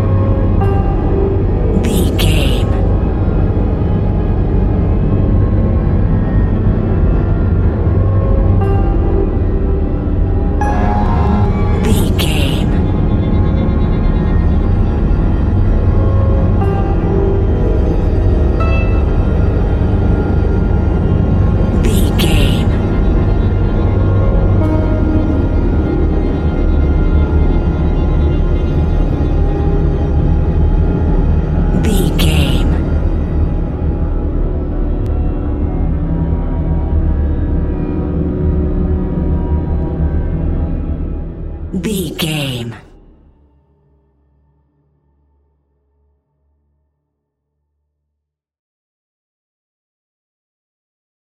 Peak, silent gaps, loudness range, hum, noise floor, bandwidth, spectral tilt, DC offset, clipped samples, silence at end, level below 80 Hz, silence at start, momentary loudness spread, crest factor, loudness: 0 dBFS; none; 4 LU; none; -76 dBFS; 13.5 kHz; -7.5 dB/octave; under 0.1%; under 0.1%; 8.45 s; -16 dBFS; 0 s; 5 LU; 12 dB; -15 LUFS